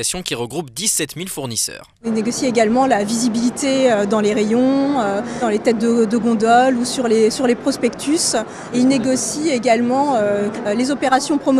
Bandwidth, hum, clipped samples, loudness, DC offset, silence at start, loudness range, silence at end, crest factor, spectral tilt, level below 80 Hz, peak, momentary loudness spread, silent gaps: 14.5 kHz; none; under 0.1%; -17 LUFS; under 0.1%; 0 s; 2 LU; 0 s; 16 dB; -3.5 dB/octave; -52 dBFS; 0 dBFS; 7 LU; none